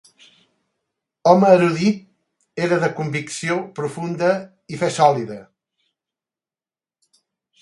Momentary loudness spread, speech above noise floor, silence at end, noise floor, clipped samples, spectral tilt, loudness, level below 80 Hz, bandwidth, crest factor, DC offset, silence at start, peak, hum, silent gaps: 15 LU; over 72 dB; 2.2 s; under -90 dBFS; under 0.1%; -6 dB/octave; -19 LUFS; -66 dBFS; 11.5 kHz; 20 dB; under 0.1%; 1.25 s; 0 dBFS; none; none